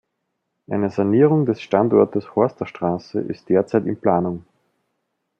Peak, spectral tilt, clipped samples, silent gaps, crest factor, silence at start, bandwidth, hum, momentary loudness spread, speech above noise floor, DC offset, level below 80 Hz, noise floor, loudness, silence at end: -2 dBFS; -9.5 dB/octave; under 0.1%; none; 18 dB; 0.7 s; 7 kHz; none; 11 LU; 57 dB; under 0.1%; -64 dBFS; -76 dBFS; -20 LUFS; 1 s